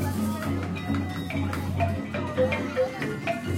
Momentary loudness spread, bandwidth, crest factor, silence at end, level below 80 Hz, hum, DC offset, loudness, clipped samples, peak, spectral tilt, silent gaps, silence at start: 4 LU; 16 kHz; 14 dB; 0 s; -50 dBFS; none; under 0.1%; -28 LUFS; under 0.1%; -12 dBFS; -6.5 dB/octave; none; 0 s